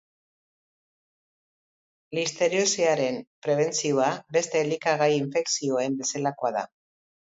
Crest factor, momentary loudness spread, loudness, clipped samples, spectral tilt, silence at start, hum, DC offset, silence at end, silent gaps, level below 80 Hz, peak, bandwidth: 18 dB; 7 LU; -25 LUFS; under 0.1%; -3.5 dB/octave; 2.1 s; none; under 0.1%; 0.6 s; 3.27-3.42 s; -76 dBFS; -8 dBFS; 8 kHz